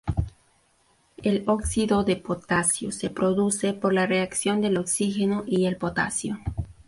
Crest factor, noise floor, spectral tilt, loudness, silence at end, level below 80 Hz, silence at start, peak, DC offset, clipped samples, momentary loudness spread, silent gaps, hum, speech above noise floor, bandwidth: 16 dB; -64 dBFS; -4.5 dB/octave; -25 LUFS; 0.05 s; -42 dBFS; 0.05 s; -10 dBFS; under 0.1%; under 0.1%; 7 LU; none; none; 40 dB; 12 kHz